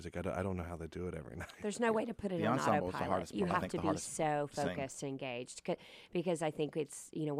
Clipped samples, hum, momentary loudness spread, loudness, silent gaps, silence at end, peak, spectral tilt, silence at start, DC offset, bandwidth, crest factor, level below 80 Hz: under 0.1%; none; 9 LU; -38 LUFS; none; 0 s; -18 dBFS; -5.5 dB/octave; 0 s; under 0.1%; 14.5 kHz; 20 dB; -62 dBFS